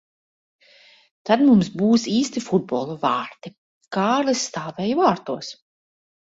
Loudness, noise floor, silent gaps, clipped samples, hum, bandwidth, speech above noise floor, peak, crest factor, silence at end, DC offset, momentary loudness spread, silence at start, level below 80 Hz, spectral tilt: -21 LUFS; -53 dBFS; 3.58-3.81 s; under 0.1%; none; 8 kHz; 32 dB; -2 dBFS; 20 dB; 0.75 s; under 0.1%; 17 LU; 1.25 s; -62 dBFS; -5 dB/octave